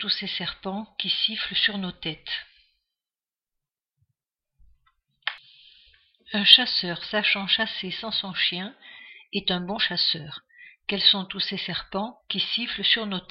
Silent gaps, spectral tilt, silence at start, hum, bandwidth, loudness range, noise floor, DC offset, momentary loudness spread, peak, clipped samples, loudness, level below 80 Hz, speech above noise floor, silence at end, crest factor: none; -4.5 dB/octave; 0 s; none; 12 kHz; 20 LU; under -90 dBFS; under 0.1%; 14 LU; 0 dBFS; under 0.1%; -23 LUFS; -62 dBFS; over 64 dB; 0.1 s; 28 dB